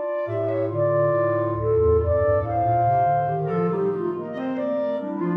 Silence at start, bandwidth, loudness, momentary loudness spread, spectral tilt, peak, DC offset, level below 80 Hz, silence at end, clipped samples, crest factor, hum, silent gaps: 0 s; 5.2 kHz; -22 LUFS; 7 LU; -11 dB/octave; -10 dBFS; under 0.1%; -42 dBFS; 0 s; under 0.1%; 12 dB; none; none